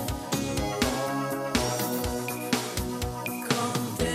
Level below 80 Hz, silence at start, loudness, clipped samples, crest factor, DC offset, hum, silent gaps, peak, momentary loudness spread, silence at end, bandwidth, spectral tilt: -42 dBFS; 0 s; -29 LUFS; under 0.1%; 20 dB; under 0.1%; none; none; -8 dBFS; 5 LU; 0 s; 16.5 kHz; -4 dB/octave